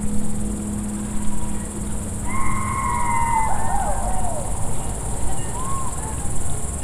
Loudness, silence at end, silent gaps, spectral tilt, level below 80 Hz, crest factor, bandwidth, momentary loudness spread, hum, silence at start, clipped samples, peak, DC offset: -25 LUFS; 0 s; none; -5 dB/octave; -28 dBFS; 14 dB; 15.5 kHz; 6 LU; none; 0 s; under 0.1%; -6 dBFS; under 0.1%